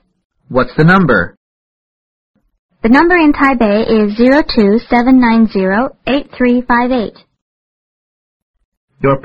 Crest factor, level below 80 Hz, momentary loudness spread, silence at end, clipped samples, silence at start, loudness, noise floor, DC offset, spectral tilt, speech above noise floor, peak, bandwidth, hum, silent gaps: 12 dB; -34 dBFS; 9 LU; 0.05 s; under 0.1%; 0.5 s; -11 LUFS; under -90 dBFS; under 0.1%; -8.5 dB/octave; over 80 dB; 0 dBFS; 6.6 kHz; none; 1.37-2.34 s, 2.59-2.69 s, 7.41-8.54 s, 8.65-8.88 s